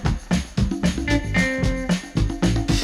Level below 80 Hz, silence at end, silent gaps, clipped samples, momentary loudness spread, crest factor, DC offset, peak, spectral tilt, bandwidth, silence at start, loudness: -28 dBFS; 0 s; none; under 0.1%; 4 LU; 14 dB; under 0.1%; -6 dBFS; -5.5 dB/octave; 13.5 kHz; 0 s; -22 LUFS